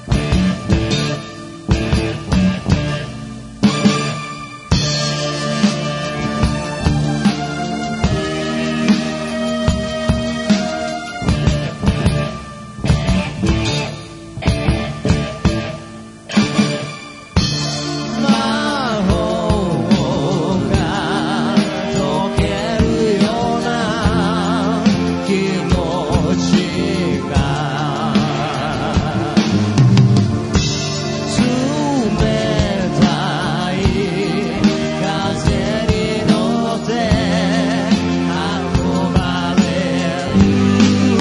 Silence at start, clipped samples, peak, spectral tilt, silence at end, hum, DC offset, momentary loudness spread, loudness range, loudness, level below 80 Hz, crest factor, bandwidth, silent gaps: 0 s; under 0.1%; 0 dBFS; -6 dB/octave; 0 s; none; under 0.1%; 6 LU; 3 LU; -17 LUFS; -30 dBFS; 16 dB; 11 kHz; none